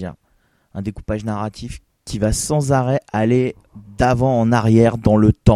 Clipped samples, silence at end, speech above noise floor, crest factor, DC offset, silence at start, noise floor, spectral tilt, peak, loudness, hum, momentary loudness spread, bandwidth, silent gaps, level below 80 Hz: under 0.1%; 0 s; 44 dB; 18 dB; under 0.1%; 0 s; -61 dBFS; -6.5 dB/octave; 0 dBFS; -17 LUFS; none; 17 LU; 13 kHz; none; -34 dBFS